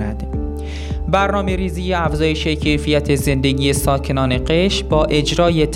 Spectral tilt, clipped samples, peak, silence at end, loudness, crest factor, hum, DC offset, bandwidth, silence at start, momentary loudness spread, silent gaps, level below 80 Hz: -5.5 dB/octave; under 0.1%; -2 dBFS; 0 s; -17 LUFS; 16 dB; none; under 0.1%; 16 kHz; 0 s; 9 LU; none; -26 dBFS